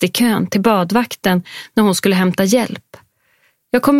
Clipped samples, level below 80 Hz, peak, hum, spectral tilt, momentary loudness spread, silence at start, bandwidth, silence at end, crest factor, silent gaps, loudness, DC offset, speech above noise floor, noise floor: under 0.1%; -54 dBFS; 0 dBFS; none; -5 dB/octave; 6 LU; 0 s; 16.5 kHz; 0 s; 16 dB; none; -16 LUFS; under 0.1%; 44 dB; -59 dBFS